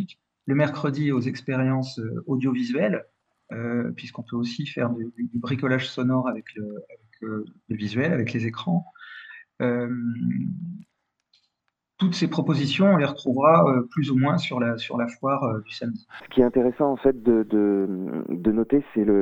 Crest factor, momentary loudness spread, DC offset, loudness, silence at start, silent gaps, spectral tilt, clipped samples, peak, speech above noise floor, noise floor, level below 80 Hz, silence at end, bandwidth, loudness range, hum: 20 dB; 14 LU; under 0.1%; -24 LUFS; 0 s; none; -7.5 dB/octave; under 0.1%; -4 dBFS; 55 dB; -79 dBFS; -56 dBFS; 0 s; 8 kHz; 7 LU; none